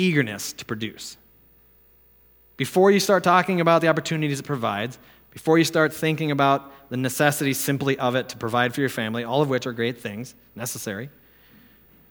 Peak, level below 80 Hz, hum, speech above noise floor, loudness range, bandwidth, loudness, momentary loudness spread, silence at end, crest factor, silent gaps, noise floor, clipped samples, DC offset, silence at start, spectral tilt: -2 dBFS; -64 dBFS; none; 33 dB; 5 LU; over 20 kHz; -23 LUFS; 15 LU; 1 s; 22 dB; none; -56 dBFS; under 0.1%; under 0.1%; 0 s; -5 dB/octave